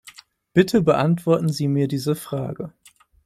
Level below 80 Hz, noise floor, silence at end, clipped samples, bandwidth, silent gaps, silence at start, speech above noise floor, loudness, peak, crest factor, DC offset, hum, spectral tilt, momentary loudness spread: -56 dBFS; -48 dBFS; 0.55 s; under 0.1%; 15 kHz; none; 0.05 s; 28 dB; -21 LUFS; -2 dBFS; 18 dB; under 0.1%; none; -7 dB/octave; 12 LU